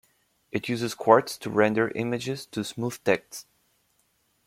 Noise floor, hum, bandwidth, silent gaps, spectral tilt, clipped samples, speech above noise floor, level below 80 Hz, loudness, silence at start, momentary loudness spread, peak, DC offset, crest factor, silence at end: -70 dBFS; none; 16.5 kHz; none; -5 dB/octave; under 0.1%; 44 dB; -68 dBFS; -26 LUFS; 0.55 s; 12 LU; -2 dBFS; under 0.1%; 24 dB; 1.05 s